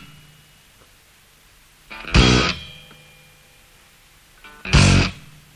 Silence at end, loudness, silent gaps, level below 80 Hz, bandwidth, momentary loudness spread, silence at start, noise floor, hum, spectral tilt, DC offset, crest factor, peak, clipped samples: 0.4 s; -17 LUFS; none; -28 dBFS; 15 kHz; 25 LU; 1.9 s; -52 dBFS; none; -4.5 dB/octave; under 0.1%; 20 dB; -2 dBFS; under 0.1%